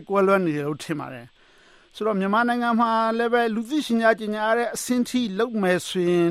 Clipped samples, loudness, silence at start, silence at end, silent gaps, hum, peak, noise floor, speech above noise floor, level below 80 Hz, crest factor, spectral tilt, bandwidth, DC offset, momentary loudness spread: under 0.1%; -23 LUFS; 0 s; 0 s; none; none; -6 dBFS; -54 dBFS; 32 dB; -64 dBFS; 18 dB; -5 dB/octave; 15.5 kHz; under 0.1%; 8 LU